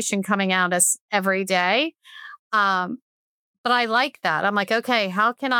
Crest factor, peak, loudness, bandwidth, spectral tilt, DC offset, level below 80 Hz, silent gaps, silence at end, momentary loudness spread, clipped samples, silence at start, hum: 18 dB; -4 dBFS; -21 LUFS; 19.5 kHz; -2.5 dB/octave; under 0.1%; -80 dBFS; 1.01-1.09 s, 2.39-2.50 s, 3.02-3.64 s; 0 s; 11 LU; under 0.1%; 0 s; none